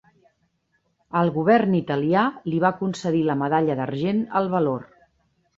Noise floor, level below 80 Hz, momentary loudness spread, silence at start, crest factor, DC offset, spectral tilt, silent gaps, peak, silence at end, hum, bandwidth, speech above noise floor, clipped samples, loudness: -70 dBFS; -62 dBFS; 6 LU; 1.15 s; 18 dB; under 0.1%; -7.5 dB/octave; none; -6 dBFS; 0.75 s; none; 8 kHz; 49 dB; under 0.1%; -22 LUFS